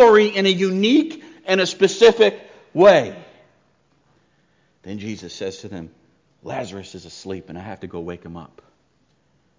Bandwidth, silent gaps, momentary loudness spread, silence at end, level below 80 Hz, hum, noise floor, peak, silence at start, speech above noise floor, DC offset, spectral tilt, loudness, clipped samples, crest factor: 7.6 kHz; none; 23 LU; 1.15 s; -56 dBFS; none; -63 dBFS; -2 dBFS; 0 s; 45 dB; under 0.1%; -4.5 dB/octave; -17 LUFS; under 0.1%; 16 dB